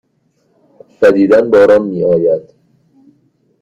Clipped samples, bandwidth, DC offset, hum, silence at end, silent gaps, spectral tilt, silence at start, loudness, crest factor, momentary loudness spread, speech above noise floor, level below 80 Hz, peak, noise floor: under 0.1%; 7.8 kHz; under 0.1%; none; 1.2 s; none; -7.5 dB/octave; 1 s; -10 LUFS; 12 dB; 6 LU; 49 dB; -50 dBFS; 0 dBFS; -59 dBFS